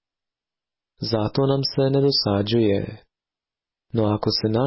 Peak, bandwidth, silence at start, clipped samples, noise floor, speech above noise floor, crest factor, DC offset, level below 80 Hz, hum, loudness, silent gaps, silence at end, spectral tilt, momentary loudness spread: -10 dBFS; 6 kHz; 1 s; under 0.1%; under -90 dBFS; over 69 dB; 14 dB; under 0.1%; -50 dBFS; none; -21 LUFS; none; 0 s; -9.5 dB/octave; 8 LU